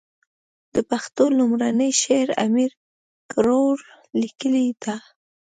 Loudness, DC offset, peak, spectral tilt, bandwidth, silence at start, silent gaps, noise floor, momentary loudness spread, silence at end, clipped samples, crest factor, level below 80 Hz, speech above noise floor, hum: -21 LUFS; under 0.1%; -6 dBFS; -3.5 dB/octave; 9.4 kHz; 0.75 s; 2.77-3.29 s; under -90 dBFS; 10 LU; 0.6 s; under 0.1%; 16 dB; -60 dBFS; over 70 dB; none